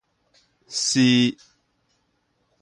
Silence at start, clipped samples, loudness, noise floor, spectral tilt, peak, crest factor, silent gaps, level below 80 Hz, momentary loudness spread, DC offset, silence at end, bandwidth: 0.7 s; under 0.1%; -20 LUFS; -70 dBFS; -3.5 dB/octave; -8 dBFS; 18 dB; none; -68 dBFS; 15 LU; under 0.1%; 1.3 s; 11.5 kHz